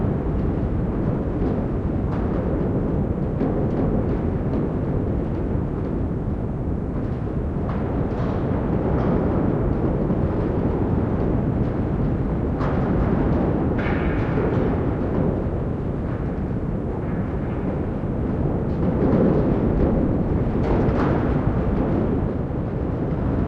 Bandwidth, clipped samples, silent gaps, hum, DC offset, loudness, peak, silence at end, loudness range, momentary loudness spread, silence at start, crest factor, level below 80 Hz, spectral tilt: 6 kHz; under 0.1%; none; none; under 0.1%; -23 LUFS; -8 dBFS; 0 s; 4 LU; 5 LU; 0 s; 14 dB; -30 dBFS; -11 dB/octave